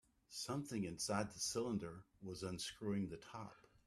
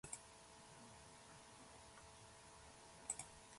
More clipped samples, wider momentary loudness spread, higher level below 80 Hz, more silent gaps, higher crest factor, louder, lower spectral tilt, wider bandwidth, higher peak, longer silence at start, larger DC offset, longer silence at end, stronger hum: neither; about the same, 12 LU vs 12 LU; about the same, -72 dBFS vs -74 dBFS; neither; second, 22 dB vs 30 dB; first, -45 LUFS vs -56 LUFS; first, -4 dB/octave vs -2 dB/octave; first, 14 kHz vs 11.5 kHz; first, -24 dBFS vs -28 dBFS; first, 0.3 s vs 0.05 s; neither; first, 0.25 s vs 0 s; neither